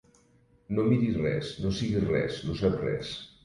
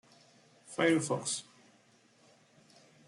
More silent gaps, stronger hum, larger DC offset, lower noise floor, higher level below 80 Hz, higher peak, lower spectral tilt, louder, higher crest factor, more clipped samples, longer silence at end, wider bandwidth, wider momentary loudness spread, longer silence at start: neither; neither; neither; about the same, -63 dBFS vs -66 dBFS; first, -48 dBFS vs -82 dBFS; about the same, -12 dBFS vs -14 dBFS; first, -7 dB/octave vs -4 dB/octave; first, -29 LUFS vs -32 LUFS; second, 16 dB vs 22 dB; neither; second, 0.15 s vs 1.65 s; about the same, 11.5 kHz vs 12 kHz; second, 7 LU vs 11 LU; about the same, 0.7 s vs 0.7 s